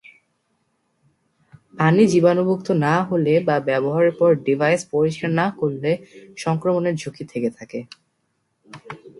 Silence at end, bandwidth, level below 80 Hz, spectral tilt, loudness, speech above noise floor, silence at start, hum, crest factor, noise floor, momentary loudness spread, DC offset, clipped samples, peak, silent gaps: 0.1 s; 11.5 kHz; -64 dBFS; -7 dB/octave; -20 LUFS; 52 dB; 1.75 s; none; 18 dB; -71 dBFS; 14 LU; under 0.1%; under 0.1%; -4 dBFS; none